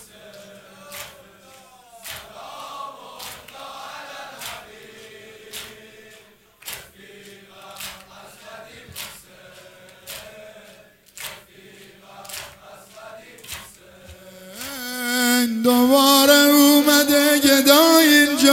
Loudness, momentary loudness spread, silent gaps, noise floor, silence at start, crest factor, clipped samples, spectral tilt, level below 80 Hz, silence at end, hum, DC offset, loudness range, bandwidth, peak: -14 LUFS; 28 LU; none; -50 dBFS; 0.9 s; 22 dB; under 0.1%; -1.5 dB/octave; -62 dBFS; 0 s; none; under 0.1%; 24 LU; 16.5 kHz; 0 dBFS